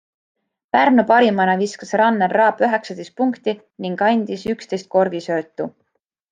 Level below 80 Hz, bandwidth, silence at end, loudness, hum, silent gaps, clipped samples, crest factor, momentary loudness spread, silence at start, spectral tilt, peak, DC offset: -64 dBFS; 9.4 kHz; 0.6 s; -18 LUFS; none; none; under 0.1%; 16 dB; 13 LU; 0.75 s; -6 dB/octave; -2 dBFS; under 0.1%